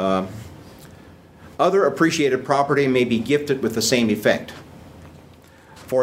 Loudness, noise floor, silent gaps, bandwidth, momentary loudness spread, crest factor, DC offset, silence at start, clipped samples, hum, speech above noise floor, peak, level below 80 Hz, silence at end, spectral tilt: -20 LUFS; -47 dBFS; none; 16 kHz; 20 LU; 20 dB; under 0.1%; 0 s; under 0.1%; none; 28 dB; -2 dBFS; -56 dBFS; 0 s; -4.5 dB/octave